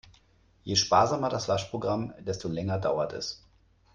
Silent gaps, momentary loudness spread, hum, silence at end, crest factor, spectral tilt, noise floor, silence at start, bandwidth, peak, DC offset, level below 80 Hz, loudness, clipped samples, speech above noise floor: none; 13 LU; none; 0.6 s; 20 dB; -4.5 dB/octave; -63 dBFS; 0.65 s; 10.5 kHz; -10 dBFS; under 0.1%; -58 dBFS; -28 LUFS; under 0.1%; 35 dB